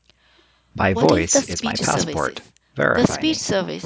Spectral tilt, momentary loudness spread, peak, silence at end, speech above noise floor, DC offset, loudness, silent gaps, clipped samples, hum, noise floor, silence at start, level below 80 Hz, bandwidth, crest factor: -4 dB/octave; 10 LU; 0 dBFS; 0 s; 38 dB; under 0.1%; -19 LUFS; none; under 0.1%; none; -57 dBFS; 0.75 s; -42 dBFS; 8 kHz; 20 dB